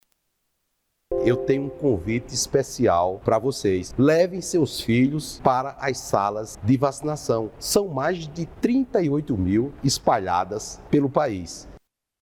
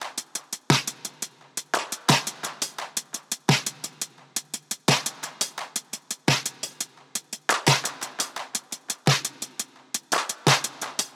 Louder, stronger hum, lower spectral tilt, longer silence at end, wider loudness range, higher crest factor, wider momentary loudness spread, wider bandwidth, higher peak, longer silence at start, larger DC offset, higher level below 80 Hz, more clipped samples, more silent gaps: first, -23 LUFS vs -26 LUFS; neither; first, -5.5 dB/octave vs -2.5 dB/octave; first, 0.45 s vs 0.05 s; about the same, 2 LU vs 2 LU; about the same, 22 dB vs 24 dB; second, 7 LU vs 11 LU; first, 19.5 kHz vs 17.5 kHz; about the same, -2 dBFS vs -4 dBFS; first, 1.1 s vs 0 s; neither; first, -48 dBFS vs -68 dBFS; neither; neither